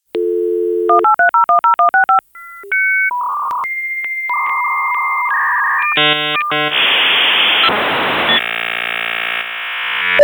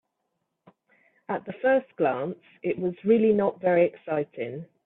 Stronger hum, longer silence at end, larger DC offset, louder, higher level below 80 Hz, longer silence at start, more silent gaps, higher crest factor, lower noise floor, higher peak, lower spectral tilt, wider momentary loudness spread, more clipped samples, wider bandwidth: neither; second, 0 s vs 0.2 s; neither; first, -13 LUFS vs -26 LUFS; first, -60 dBFS vs -70 dBFS; second, 0.15 s vs 1.3 s; neither; about the same, 14 dB vs 18 dB; second, -35 dBFS vs -79 dBFS; first, 0 dBFS vs -10 dBFS; second, -3.5 dB/octave vs -11 dB/octave; second, 9 LU vs 12 LU; neither; first, over 20 kHz vs 4 kHz